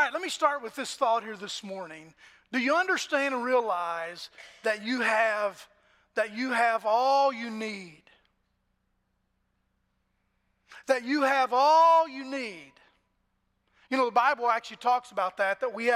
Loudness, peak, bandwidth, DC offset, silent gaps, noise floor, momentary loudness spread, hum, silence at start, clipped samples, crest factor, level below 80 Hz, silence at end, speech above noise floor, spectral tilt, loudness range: -27 LUFS; -10 dBFS; 15.5 kHz; under 0.1%; none; -75 dBFS; 14 LU; 60 Hz at -65 dBFS; 0 s; under 0.1%; 18 dB; -78 dBFS; 0 s; 48 dB; -2.5 dB/octave; 6 LU